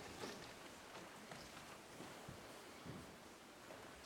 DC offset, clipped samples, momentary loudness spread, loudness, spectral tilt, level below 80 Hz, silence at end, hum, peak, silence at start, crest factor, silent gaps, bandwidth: under 0.1%; under 0.1%; 6 LU; -55 LUFS; -3.5 dB/octave; -74 dBFS; 0 s; none; -36 dBFS; 0 s; 18 dB; none; 19 kHz